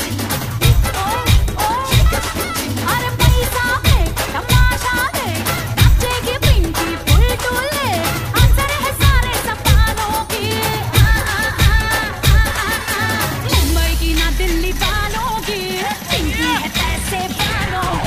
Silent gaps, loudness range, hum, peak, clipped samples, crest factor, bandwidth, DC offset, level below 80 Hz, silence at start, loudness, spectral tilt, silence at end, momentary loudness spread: none; 2 LU; none; 0 dBFS; under 0.1%; 14 dB; 15.5 kHz; 0.2%; -20 dBFS; 0 s; -16 LUFS; -4 dB/octave; 0 s; 5 LU